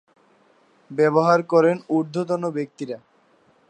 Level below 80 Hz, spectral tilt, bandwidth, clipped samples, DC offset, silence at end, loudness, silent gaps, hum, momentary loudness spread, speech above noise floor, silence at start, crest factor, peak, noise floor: -78 dBFS; -7.5 dB/octave; 9.4 kHz; under 0.1%; under 0.1%; 0.7 s; -21 LUFS; none; none; 16 LU; 39 dB; 0.9 s; 20 dB; -4 dBFS; -59 dBFS